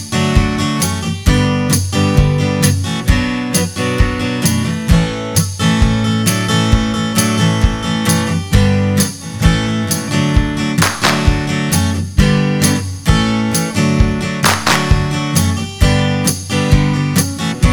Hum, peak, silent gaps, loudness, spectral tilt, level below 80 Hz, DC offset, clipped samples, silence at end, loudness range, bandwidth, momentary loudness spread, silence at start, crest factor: none; 0 dBFS; none; -14 LUFS; -4.5 dB/octave; -22 dBFS; under 0.1%; 0.2%; 0 s; 1 LU; over 20 kHz; 3 LU; 0 s; 14 dB